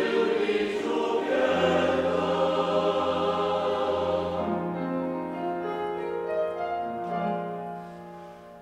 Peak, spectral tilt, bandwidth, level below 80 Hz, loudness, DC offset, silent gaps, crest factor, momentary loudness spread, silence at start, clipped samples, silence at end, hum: -12 dBFS; -6 dB/octave; 10.5 kHz; -60 dBFS; -27 LUFS; under 0.1%; none; 16 dB; 10 LU; 0 s; under 0.1%; 0 s; none